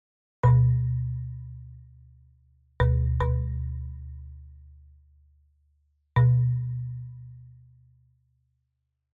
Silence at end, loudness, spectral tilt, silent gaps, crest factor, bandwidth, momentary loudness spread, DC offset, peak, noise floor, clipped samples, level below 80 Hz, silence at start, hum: 1.7 s; -26 LUFS; -8.5 dB/octave; none; 18 dB; 3.8 kHz; 24 LU; under 0.1%; -10 dBFS; -79 dBFS; under 0.1%; -38 dBFS; 0.45 s; none